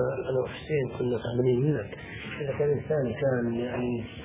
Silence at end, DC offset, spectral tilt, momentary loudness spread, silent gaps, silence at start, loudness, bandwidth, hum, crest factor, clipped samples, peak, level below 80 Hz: 0 s; under 0.1%; -11.5 dB/octave; 8 LU; none; 0 s; -29 LUFS; 4 kHz; none; 14 dB; under 0.1%; -14 dBFS; -52 dBFS